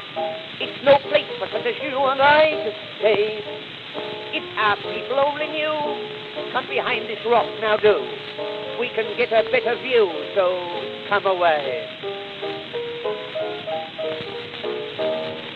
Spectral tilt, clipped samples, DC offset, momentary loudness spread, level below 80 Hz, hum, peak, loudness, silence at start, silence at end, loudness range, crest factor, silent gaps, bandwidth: -5.5 dB/octave; under 0.1%; under 0.1%; 12 LU; -66 dBFS; none; -4 dBFS; -22 LUFS; 0 s; 0 s; 6 LU; 20 dB; none; 7.2 kHz